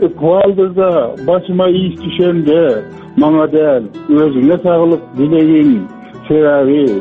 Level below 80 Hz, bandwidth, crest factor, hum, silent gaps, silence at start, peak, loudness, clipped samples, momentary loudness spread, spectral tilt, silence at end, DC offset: -48 dBFS; 4.2 kHz; 10 dB; none; none; 0 s; 0 dBFS; -12 LUFS; under 0.1%; 6 LU; -9.5 dB/octave; 0 s; under 0.1%